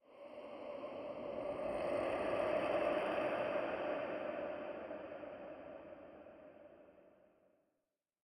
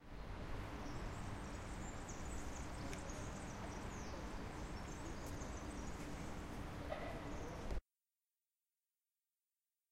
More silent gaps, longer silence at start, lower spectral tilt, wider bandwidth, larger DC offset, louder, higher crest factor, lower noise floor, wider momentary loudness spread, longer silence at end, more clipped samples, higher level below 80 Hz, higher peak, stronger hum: neither; about the same, 0.1 s vs 0 s; about the same, -6 dB/octave vs -5 dB/octave; second, 10.5 kHz vs 16 kHz; neither; first, -41 LUFS vs -49 LUFS; about the same, 18 dB vs 16 dB; about the same, -89 dBFS vs under -90 dBFS; first, 19 LU vs 2 LU; second, 1.15 s vs 2.1 s; neither; second, -72 dBFS vs -52 dBFS; first, -24 dBFS vs -32 dBFS; neither